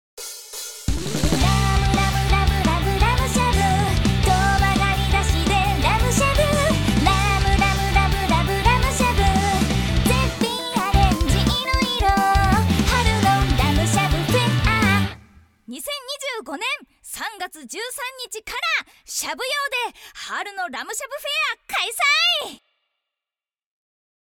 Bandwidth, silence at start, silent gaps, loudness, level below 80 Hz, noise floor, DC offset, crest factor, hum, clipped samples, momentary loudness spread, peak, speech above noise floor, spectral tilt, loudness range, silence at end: 19 kHz; 0.15 s; none; -20 LUFS; -26 dBFS; under -90 dBFS; under 0.1%; 18 dB; none; under 0.1%; 11 LU; -4 dBFS; over 66 dB; -4.5 dB/octave; 7 LU; 1.65 s